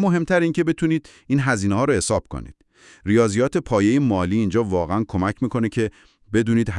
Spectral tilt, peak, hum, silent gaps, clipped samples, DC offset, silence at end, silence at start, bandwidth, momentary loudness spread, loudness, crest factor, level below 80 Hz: -6.5 dB/octave; -4 dBFS; none; none; under 0.1%; under 0.1%; 0 s; 0 s; 12 kHz; 7 LU; -21 LUFS; 18 dB; -46 dBFS